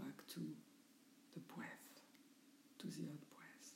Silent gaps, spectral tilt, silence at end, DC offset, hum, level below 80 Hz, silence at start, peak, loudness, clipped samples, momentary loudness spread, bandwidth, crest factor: none; -5 dB/octave; 0 s; under 0.1%; none; under -90 dBFS; 0 s; -36 dBFS; -55 LUFS; under 0.1%; 17 LU; 16 kHz; 20 dB